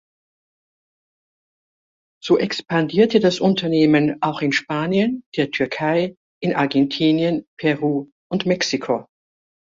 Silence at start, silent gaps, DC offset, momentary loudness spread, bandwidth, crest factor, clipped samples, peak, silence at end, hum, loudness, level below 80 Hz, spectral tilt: 2.25 s; 5.26-5.32 s, 6.17-6.41 s, 7.47-7.57 s, 8.12-8.30 s; under 0.1%; 8 LU; 7.6 kHz; 18 dB; under 0.1%; -2 dBFS; 0.7 s; none; -20 LUFS; -60 dBFS; -5.5 dB/octave